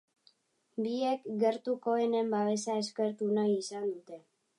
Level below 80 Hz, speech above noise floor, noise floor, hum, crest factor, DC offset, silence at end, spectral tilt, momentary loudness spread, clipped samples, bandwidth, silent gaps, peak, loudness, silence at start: -86 dBFS; 38 dB; -69 dBFS; none; 16 dB; under 0.1%; 0.4 s; -5 dB/octave; 10 LU; under 0.1%; 11 kHz; none; -16 dBFS; -32 LUFS; 0.75 s